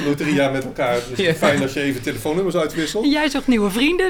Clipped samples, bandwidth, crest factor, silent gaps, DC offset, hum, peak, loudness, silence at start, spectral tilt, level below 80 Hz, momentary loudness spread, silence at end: under 0.1%; 19.5 kHz; 16 dB; none; under 0.1%; none; -2 dBFS; -19 LUFS; 0 s; -5 dB/octave; -42 dBFS; 5 LU; 0 s